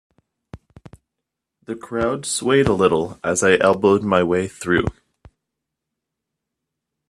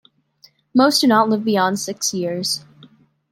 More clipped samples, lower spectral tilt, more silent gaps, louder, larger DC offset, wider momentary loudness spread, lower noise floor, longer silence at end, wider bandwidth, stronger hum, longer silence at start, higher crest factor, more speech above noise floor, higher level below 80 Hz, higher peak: neither; about the same, -4.5 dB/octave vs -3.5 dB/octave; neither; about the same, -18 LUFS vs -18 LUFS; neither; first, 11 LU vs 8 LU; first, -82 dBFS vs -54 dBFS; first, 2.2 s vs 0.75 s; second, 13 kHz vs 16.5 kHz; neither; second, 0.55 s vs 0.75 s; about the same, 20 dB vs 18 dB; first, 64 dB vs 37 dB; first, -48 dBFS vs -68 dBFS; about the same, -2 dBFS vs -2 dBFS